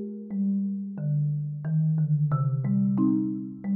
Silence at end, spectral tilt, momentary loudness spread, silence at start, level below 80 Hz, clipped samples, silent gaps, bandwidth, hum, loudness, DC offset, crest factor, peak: 0 s; -14.5 dB/octave; 7 LU; 0 s; -66 dBFS; under 0.1%; none; 2.1 kHz; none; -27 LUFS; under 0.1%; 12 dB; -14 dBFS